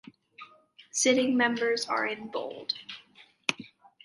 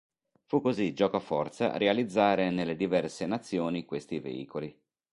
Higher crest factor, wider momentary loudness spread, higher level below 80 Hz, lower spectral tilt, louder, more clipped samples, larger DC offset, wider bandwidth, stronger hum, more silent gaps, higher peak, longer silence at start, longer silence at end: about the same, 24 dB vs 20 dB; first, 22 LU vs 11 LU; second, -80 dBFS vs -66 dBFS; second, -2 dB/octave vs -6 dB/octave; about the same, -28 LUFS vs -30 LUFS; neither; neither; about the same, 11.5 kHz vs 11.5 kHz; neither; neither; about the same, -8 dBFS vs -10 dBFS; about the same, 0.4 s vs 0.5 s; about the same, 0.35 s vs 0.4 s